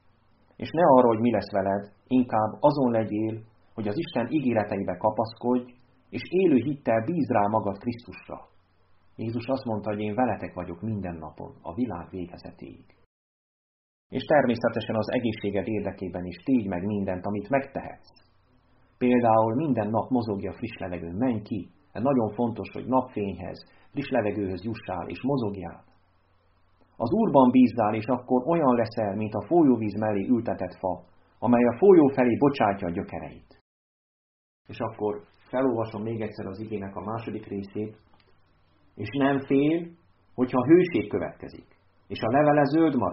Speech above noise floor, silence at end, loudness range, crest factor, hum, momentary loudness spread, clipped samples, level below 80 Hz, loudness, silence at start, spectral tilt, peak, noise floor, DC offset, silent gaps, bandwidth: 38 dB; 0 s; 9 LU; 22 dB; none; 17 LU; under 0.1%; -60 dBFS; -26 LUFS; 0.6 s; -6.5 dB/octave; -4 dBFS; -64 dBFS; under 0.1%; 13.06-14.10 s, 33.61-34.65 s; 5.8 kHz